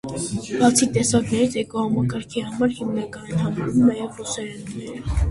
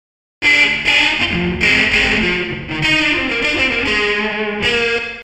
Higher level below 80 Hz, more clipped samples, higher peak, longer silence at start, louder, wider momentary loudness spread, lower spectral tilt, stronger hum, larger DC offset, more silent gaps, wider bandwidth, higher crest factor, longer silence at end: about the same, -34 dBFS vs -36 dBFS; neither; about the same, -2 dBFS vs 0 dBFS; second, 0.05 s vs 0.4 s; second, -22 LUFS vs -14 LUFS; first, 11 LU vs 6 LU; first, -5 dB/octave vs -3.5 dB/octave; neither; neither; neither; second, 11.5 kHz vs 15.5 kHz; about the same, 18 dB vs 16 dB; about the same, 0 s vs 0 s